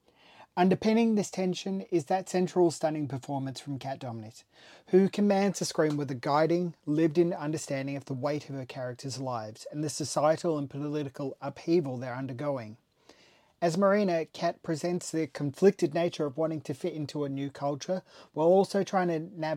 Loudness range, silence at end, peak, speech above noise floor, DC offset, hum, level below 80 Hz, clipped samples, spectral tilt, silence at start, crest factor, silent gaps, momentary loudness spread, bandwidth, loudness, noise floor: 4 LU; 0 s; -10 dBFS; 33 dB; under 0.1%; none; -74 dBFS; under 0.1%; -6 dB/octave; 0.4 s; 18 dB; none; 12 LU; 15 kHz; -30 LUFS; -62 dBFS